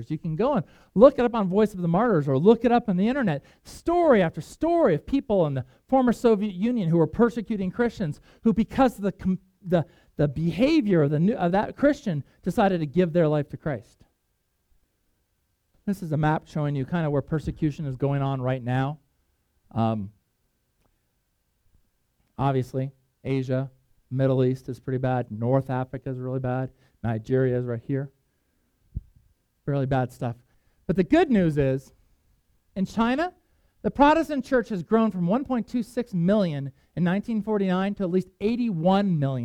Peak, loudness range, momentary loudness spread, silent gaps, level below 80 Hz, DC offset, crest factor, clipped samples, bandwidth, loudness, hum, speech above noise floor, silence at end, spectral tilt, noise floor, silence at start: -2 dBFS; 9 LU; 12 LU; none; -50 dBFS; under 0.1%; 22 dB; under 0.1%; 14 kHz; -25 LUFS; none; 50 dB; 0 s; -8.5 dB/octave; -73 dBFS; 0 s